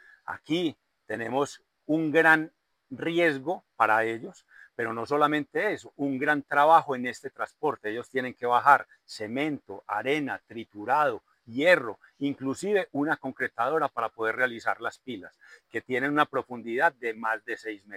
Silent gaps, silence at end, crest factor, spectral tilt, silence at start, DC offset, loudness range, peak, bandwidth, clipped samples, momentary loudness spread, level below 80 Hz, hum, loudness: none; 0 s; 22 dB; -5 dB/octave; 0.3 s; under 0.1%; 4 LU; -4 dBFS; 16 kHz; under 0.1%; 16 LU; -76 dBFS; none; -27 LUFS